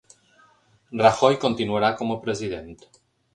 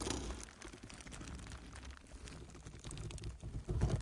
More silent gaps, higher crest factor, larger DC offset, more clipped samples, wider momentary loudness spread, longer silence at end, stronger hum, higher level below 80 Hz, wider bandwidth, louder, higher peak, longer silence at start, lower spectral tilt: neither; about the same, 22 dB vs 22 dB; neither; neither; first, 15 LU vs 12 LU; first, 0.6 s vs 0 s; neither; second, -56 dBFS vs -48 dBFS; about the same, 11 kHz vs 11.5 kHz; first, -22 LUFS vs -47 LUFS; first, -2 dBFS vs -22 dBFS; first, 0.9 s vs 0 s; about the same, -5 dB/octave vs -5 dB/octave